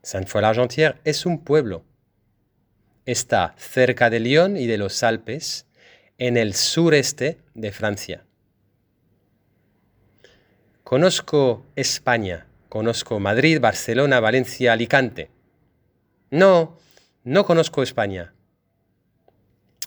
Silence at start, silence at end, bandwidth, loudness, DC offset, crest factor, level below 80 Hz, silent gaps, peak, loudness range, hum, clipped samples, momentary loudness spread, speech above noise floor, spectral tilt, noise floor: 0.05 s; 0 s; over 20 kHz; -20 LUFS; under 0.1%; 22 dB; -58 dBFS; none; 0 dBFS; 5 LU; none; under 0.1%; 14 LU; 49 dB; -4.5 dB/octave; -68 dBFS